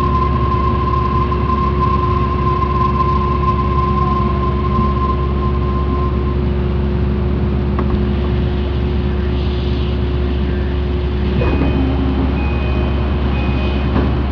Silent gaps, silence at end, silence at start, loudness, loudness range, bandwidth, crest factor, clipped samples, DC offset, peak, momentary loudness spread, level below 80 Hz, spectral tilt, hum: none; 0 s; 0 s; -17 LUFS; 2 LU; 5.4 kHz; 12 dB; under 0.1%; under 0.1%; -4 dBFS; 3 LU; -18 dBFS; -9.5 dB/octave; none